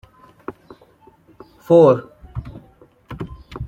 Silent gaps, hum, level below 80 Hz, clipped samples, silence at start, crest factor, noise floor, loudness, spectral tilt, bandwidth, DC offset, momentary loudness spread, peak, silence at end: none; none; -44 dBFS; under 0.1%; 0.5 s; 18 dB; -51 dBFS; -14 LUFS; -9 dB/octave; 8.2 kHz; under 0.1%; 25 LU; -2 dBFS; 0 s